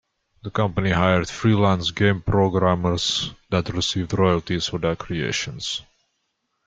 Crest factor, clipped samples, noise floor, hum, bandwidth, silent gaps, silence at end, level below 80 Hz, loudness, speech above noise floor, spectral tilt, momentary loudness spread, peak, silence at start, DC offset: 18 dB; under 0.1%; -74 dBFS; none; 9.2 kHz; none; 0.85 s; -46 dBFS; -22 LUFS; 53 dB; -5 dB/octave; 7 LU; -4 dBFS; 0.45 s; under 0.1%